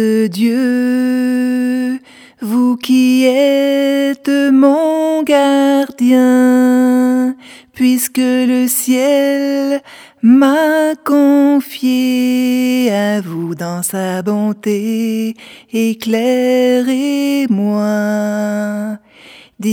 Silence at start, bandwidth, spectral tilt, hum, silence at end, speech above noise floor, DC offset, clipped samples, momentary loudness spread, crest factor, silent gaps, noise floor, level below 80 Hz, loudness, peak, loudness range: 0 s; 19.5 kHz; -5 dB/octave; none; 0 s; 28 dB; under 0.1%; under 0.1%; 9 LU; 12 dB; none; -41 dBFS; -66 dBFS; -13 LUFS; 0 dBFS; 4 LU